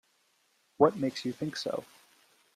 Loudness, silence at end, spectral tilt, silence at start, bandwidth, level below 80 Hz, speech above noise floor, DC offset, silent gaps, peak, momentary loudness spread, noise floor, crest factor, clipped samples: -31 LUFS; 0.7 s; -5.5 dB/octave; 0.8 s; 14.5 kHz; -74 dBFS; 42 dB; under 0.1%; none; -10 dBFS; 10 LU; -71 dBFS; 24 dB; under 0.1%